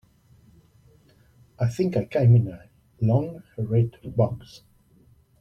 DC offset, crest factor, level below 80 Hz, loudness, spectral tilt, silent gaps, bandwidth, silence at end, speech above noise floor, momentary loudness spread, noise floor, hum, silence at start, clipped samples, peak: under 0.1%; 18 dB; -54 dBFS; -24 LUFS; -9.5 dB/octave; none; 7 kHz; 0.85 s; 35 dB; 15 LU; -58 dBFS; none; 1.6 s; under 0.1%; -8 dBFS